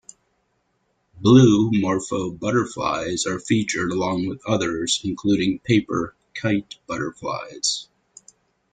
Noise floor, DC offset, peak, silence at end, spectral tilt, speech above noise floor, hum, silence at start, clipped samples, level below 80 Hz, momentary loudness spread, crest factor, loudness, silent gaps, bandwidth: -69 dBFS; under 0.1%; -2 dBFS; 0.9 s; -5 dB/octave; 49 dB; none; 1.15 s; under 0.1%; -54 dBFS; 13 LU; 20 dB; -22 LUFS; none; 9.6 kHz